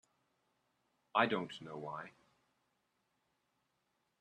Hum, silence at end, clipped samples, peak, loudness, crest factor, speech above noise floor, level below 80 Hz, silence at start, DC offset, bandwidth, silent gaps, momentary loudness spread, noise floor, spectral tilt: none; 2.1 s; under 0.1%; -16 dBFS; -38 LUFS; 28 dB; 45 dB; -84 dBFS; 1.15 s; under 0.1%; 11.5 kHz; none; 15 LU; -83 dBFS; -5.5 dB/octave